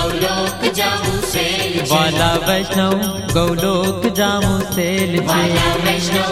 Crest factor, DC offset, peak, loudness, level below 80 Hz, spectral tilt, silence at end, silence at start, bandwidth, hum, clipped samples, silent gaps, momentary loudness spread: 16 dB; under 0.1%; 0 dBFS; -16 LUFS; -34 dBFS; -4 dB/octave; 0 s; 0 s; 16 kHz; none; under 0.1%; none; 3 LU